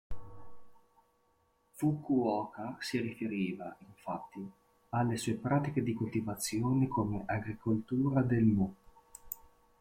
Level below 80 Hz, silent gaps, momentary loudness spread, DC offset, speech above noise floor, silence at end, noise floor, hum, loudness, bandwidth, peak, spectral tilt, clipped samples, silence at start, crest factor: -60 dBFS; none; 16 LU; under 0.1%; 40 dB; 0.45 s; -73 dBFS; none; -34 LUFS; 16.5 kHz; -18 dBFS; -6.5 dB/octave; under 0.1%; 0.1 s; 18 dB